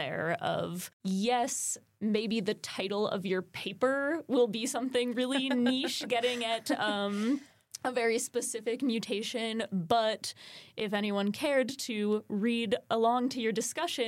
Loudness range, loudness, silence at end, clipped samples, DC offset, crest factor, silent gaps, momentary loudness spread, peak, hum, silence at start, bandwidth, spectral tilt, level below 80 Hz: 2 LU; -31 LUFS; 0 s; under 0.1%; under 0.1%; 20 dB; 0.93-1.00 s; 6 LU; -12 dBFS; none; 0 s; 16.5 kHz; -3.5 dB/octave; -78 dBFS